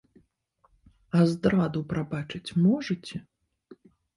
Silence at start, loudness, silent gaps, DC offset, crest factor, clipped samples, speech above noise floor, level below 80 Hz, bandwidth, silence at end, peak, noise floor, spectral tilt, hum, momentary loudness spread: 1.15 s; -27 LUFS; none; under 0.1%; 18 dB; under 0.1%; 43 dB; -58 dBFS; 11.5 kHz; 0.4 s; -10 dBFS; -69 dBFS; -7.5 dB/octave; none; 11 LU